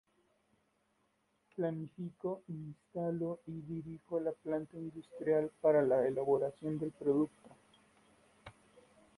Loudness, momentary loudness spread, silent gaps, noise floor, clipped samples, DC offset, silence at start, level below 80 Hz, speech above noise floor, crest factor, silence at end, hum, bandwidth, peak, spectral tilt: -37 LUFS; 15 LU; none; -78 dBFS; under 0.1%; under 0.1%; 1.55 s; -74 dBFS; 42 dB; 20 dB; 0.65 s; none; 11.5 kHz; -18 dBFS; -9 dB/octave